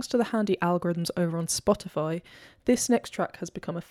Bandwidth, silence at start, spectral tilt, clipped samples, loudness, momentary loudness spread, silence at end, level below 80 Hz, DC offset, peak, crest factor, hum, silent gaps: 15.5 kHz; 0 s; -5 dB/octave; under 0.1%; -28 LUFS; 9 LU; 0.05 s; -58 dBFS; under 0.1%; -10 dBFS; 18 dB; none; none